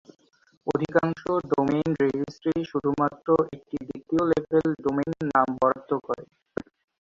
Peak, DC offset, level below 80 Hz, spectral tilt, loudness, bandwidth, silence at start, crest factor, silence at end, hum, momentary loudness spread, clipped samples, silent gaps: -6 dBFS; under 0.1%; -58 dBFS; -8 dB/octave; -26 LUFS; 7.6 kHz; 0.65 s; 20 dB; 0.4 s; none; 12 LU; under 0.1%; none